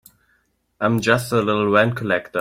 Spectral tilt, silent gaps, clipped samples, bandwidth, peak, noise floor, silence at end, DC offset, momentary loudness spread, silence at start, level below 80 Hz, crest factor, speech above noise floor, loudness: -5.5 dB/octave; none; under 0.1%; 16 kHz; -2 dBFS; -65 dBFS; 0 s; under 0.1%; 5 LU; 0.8 s; -56 dBFS; 18 dB; 47 dB; -19 LUFS